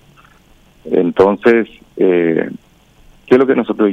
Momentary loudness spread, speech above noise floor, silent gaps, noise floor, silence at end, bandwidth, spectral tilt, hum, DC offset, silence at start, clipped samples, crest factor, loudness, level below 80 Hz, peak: 11 LU; 35 dB; none; -48 dBFS; 0 s; 7.2 kHz; -8 dB/octave; none; under 0.1%; 0.85 s; under 0.1%; 14 dB; -13 LUFS; -52 dBFS; 0 dBFS